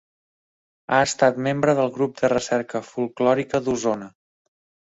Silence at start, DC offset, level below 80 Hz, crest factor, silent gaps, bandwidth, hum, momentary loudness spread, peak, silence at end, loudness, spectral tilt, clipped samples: 0.9 s; under 0.1%; -60 dBFS; 20 dB; none; 8.2 kHz; none; 7 LU; -4 dBFS; 0.8 s; -22 LUFS; -5 dB/octave; under 0.1%